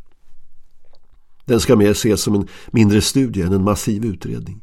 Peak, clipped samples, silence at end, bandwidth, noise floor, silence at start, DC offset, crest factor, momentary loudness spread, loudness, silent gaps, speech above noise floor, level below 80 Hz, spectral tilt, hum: 0 dBFS; under 0.1%; 0.05 s; 16.5 kHz; -41 dBFS; 0 s; under 0.1%; 18 dB; 10 LU; -17 LUFS; none; 24 dB; -38 dBFS; -5.5 dB/octave; none